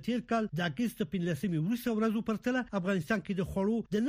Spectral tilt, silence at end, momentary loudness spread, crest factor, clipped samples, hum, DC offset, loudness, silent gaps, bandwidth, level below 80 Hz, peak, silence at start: -6.5 dB/octave; 0 s; 3 LU; 16 dB; under 0.1%; none; under 0.1%; -32 LUFS; none; 15.5 kHz; -58 dBFS; -16 dBFS; 0 s